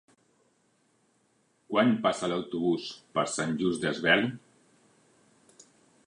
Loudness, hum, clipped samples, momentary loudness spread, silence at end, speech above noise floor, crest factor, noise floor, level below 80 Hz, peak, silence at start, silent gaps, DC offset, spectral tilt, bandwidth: -28 LUFS; none; under 0.1%; 9 LU; 1.7 s; 42 dB; 24 dB; -70 dBFS; -70 dBFS; -8 dBFS; 1.7 s; none; under 0.1%; -4.5 dB/octave; 11 kHz